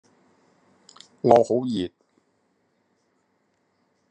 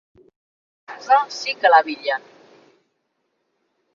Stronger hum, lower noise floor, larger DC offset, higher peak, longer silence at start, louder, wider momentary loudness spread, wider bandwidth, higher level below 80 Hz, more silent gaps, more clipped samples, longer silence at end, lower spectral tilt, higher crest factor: neither; about the same, -70 dBFS vs -72 dBFS; neither; about the same, -2 dBFS vs -2 dBFS; first, 1.25 s vs 0.9 s; second, -22 LUFS vs -18 LUFS; second, 12 LU vs 17 LU; first, 8.8 kHz vs 7.4 kHz; first, -72 dBFS vs -78 dBFS; neither; neither; first, 2.25 s vs 1.75 s; first, -7 dB/octave vs -1 dB/octave; about the same, 26 dB vs 22 dB